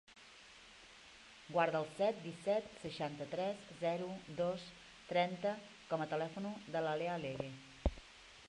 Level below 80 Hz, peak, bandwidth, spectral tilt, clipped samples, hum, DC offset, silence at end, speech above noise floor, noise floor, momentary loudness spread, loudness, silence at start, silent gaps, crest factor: -54 dBFS; -18 dBFS; 11.5 kHz; -5.5 dB/octave; under 0.1%; none; under 0.1%; 0 s; 20 dB; -60 dBFS; 20 LU; -40 LUFS; 0.1 s; none; 22 dB